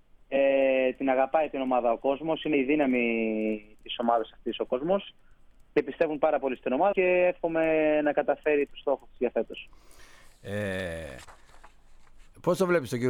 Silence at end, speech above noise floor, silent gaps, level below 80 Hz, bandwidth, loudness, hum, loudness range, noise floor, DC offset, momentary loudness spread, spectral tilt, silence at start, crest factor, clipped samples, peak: 0 s; 27 dB; none; -56 dBFS; 15 kHz; -27 LUFS; none; 9 LU; -54 dBFS; under 0.1%; 12 LU; -6 dB/octave; 0.3 s; 18 dB; under 0.1%; -10 dBFS